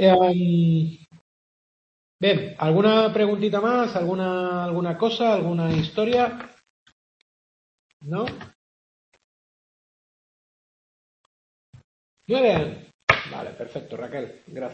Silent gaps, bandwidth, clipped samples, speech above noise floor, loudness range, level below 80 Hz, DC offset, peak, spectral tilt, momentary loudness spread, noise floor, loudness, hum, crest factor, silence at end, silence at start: 1.21-2.19 s, 6.70-6.86 s, 6.92-8.00 s, 8.55-9.12 s, 9.24-11.73 s, 11.84-12.17 s, 12.94-13.07 s; 7 kHz; under 0.1%; over 68 dB; 16 LU; -58 dBFS; under 0.1%; 0 dBFS; -7.5 dB/octave; 16 LU; under -90 dBFS; -22 LUFS; none; 24 dB; 0 s; 0 s